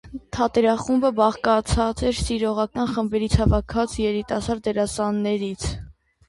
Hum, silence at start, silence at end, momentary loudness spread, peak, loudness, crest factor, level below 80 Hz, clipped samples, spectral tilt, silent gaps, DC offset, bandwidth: none; 0.05 s; 0.35 s; 6 LU; -4 dBFS; -22 LUFS; 18 dB; -34 dBFS; under 0.1%; -6 dB/octave; none; under 0.1%; 11.5 kHz